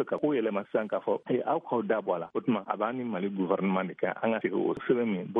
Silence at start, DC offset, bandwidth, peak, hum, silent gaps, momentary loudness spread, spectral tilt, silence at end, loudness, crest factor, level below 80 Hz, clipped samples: 0 s; under 0.1%; 3.8 kHz; -12 dBFS; none; none; 3 LU; -9.5 dB/octave; 0 s; -30 LUFS; 18 dB; -76 dBFS; under 0.1%